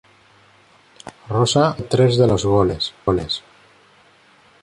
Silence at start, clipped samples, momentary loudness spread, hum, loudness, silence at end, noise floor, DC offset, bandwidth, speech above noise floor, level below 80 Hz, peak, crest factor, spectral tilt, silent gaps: 1.05 s; under 0.1%; 17 LU; none; -18 LUFS; 1.25 s; -52 dBFS; under 0.1%; 11.5 kHz; 35 dB; -42 dBFS; -2 dBFS; 18 dB; -6 dB/octave; none